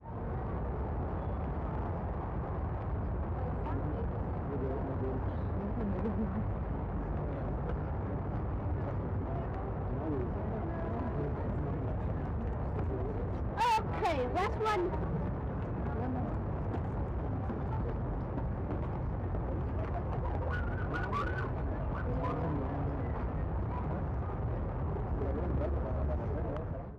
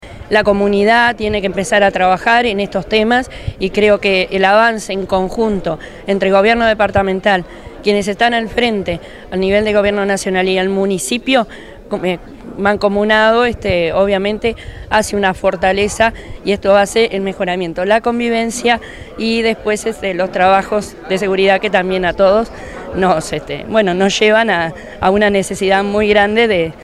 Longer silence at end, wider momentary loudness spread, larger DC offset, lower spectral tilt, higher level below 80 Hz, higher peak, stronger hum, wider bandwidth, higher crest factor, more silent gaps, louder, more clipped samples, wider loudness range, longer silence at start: about the same, 0 s vs 0 s; second, 4 LU vs 9 LU; neither; first, -8.5 dB/octave vs -4.5 dB/octave; about the same, -40 dBFS vs -38 dBFS; second, -24 dBFS vs 0 dBFS; neither; second, 8.8 kHz vs 13.5 kHz; about the same, 10 dB vs 14 dB; neither; second, -36 LUFS vs -14 LUFS; neither; about the same, 3 LU vs 2 LU; about the same, 0 s vs 0 s